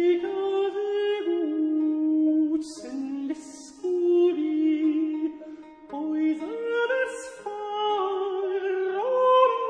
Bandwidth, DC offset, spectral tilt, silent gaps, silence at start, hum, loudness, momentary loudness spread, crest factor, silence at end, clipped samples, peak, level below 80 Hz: 10 kHz; under 0.1%; -3.5 dB/octave; none; 0 s; none; -26 LUFS; 13 LU; 18 dB; 0 s; under 0.1%; -8 dBFS; -72 dBFS